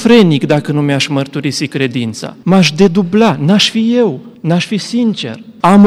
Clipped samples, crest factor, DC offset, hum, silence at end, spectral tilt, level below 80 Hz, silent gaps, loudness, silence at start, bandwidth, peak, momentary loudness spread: 0.1%; 10 dB; under 0.1%; none; 0 s; -5.5 dB/octave; -50 dBFS; none; -12 LUFS; 0 s; 12.5 kHz; 0 dBFS; 9 LU